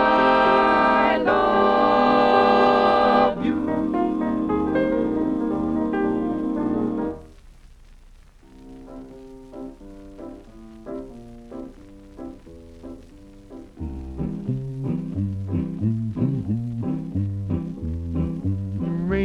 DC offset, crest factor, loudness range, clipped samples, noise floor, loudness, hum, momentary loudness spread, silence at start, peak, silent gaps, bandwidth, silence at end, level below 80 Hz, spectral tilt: under 0.1%; 18 dB; 22 LU; under 0.1%; -48 dBFS; -21 LUFS; none; 24 LU; 0 s; -4 dBFS; none; 9.4 kHz; 0 s; -42 dBFS; -8 dB/octave